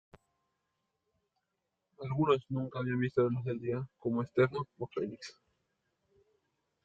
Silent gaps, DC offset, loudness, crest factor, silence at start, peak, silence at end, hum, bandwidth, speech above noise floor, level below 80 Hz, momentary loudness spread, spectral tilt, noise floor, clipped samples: none; under 0.1%; -34 LUFS; 22 dB; 2 s; -14 dBFS; 1.55 s; none; 7.8 kHz; 52 dB; -72 dBFS; 10 LU; -8 dB/octave; -85 dBFS; under 0.1%